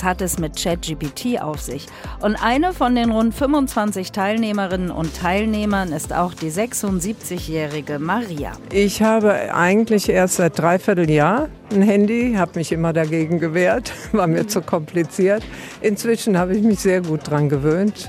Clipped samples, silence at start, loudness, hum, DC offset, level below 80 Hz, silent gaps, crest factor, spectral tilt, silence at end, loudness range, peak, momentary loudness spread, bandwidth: under 0.1%; 0 s; -19 LUFS; none; under 0.1%; -38 dBFS; none; 16 dB; -5.5 dB/octave; 0 s; 5 LU; -2 dBFS; 8 LU; 16 kHz